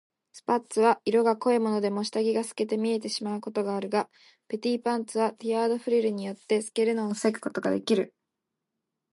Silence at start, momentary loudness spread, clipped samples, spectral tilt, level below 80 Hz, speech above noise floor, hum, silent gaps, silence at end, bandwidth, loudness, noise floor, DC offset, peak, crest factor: 0.35 s; 7 LU; under 0.1%; -5 dB/octave; -80 dBFS; 58 dB; none; none; 1.05 s; 11.5 kHz; -27 LUFS; -85 dBFS; under 0.1%; -10 dBFS; 18 dB